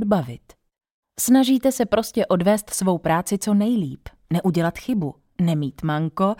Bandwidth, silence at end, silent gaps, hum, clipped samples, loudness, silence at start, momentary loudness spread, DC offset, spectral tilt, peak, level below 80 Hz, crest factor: 17 kHz; 0.05 s; 0.92-1.03 s; none; under 0.1%; -21 LUFS; 0 s; 11 LU; under 0.1%; -5.5 dB/octave; -4 dBFS; -52 dBFS; 16 dB